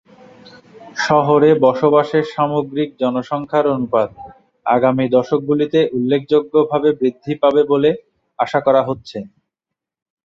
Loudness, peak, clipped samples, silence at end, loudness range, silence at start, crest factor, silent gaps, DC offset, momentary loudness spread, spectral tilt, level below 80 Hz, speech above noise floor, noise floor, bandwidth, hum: -16 LUFS; 0 dBFS; under 0.1%; 0.95 s; 2 LU; 0.8 s; 16 dB; none; under 0.1%; 10 LU; -7 dB/octave; -58 dBFS; 68 dB; -83 dBFS; 7.4 kHz; none